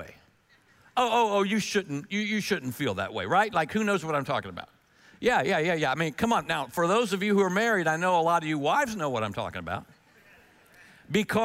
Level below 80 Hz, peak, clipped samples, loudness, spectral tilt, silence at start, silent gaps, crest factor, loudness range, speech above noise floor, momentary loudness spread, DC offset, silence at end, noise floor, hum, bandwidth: -62 dBFS; -10 dBFS; under 0.1%; -27 LUFS; -4.5 dB/octave; 0 s; none; 18 dB; 3 LU; 36 dB; 8 LU; under 0.1%; 0 s; -62 dBFS; none; 16 kHz